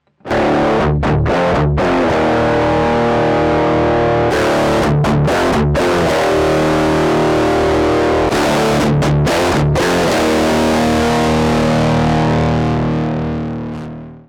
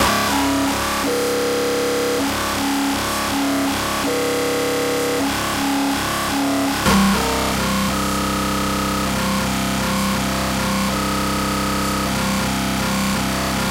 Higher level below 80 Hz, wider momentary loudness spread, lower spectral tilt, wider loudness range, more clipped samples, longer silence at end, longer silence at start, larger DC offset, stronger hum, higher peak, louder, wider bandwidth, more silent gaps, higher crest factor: first, -28 dBFS vs -34 dBFS; about the same, 3 LU vs 2 LU; first, -6 dB/octave vs -4 dB/octave; about the same, 1 LU vs 1 LU; neither; about the same, 0.1 s vs 0 s; first, 0.25 s vs 0 s; neither; neither; about the same, -6 dBFS vs -4 dBFS; first, -14 LUFS vs -19 LUFS; about the same, 17 kHz vs 16 kHz; neither; second, 8 dB vs 16 dB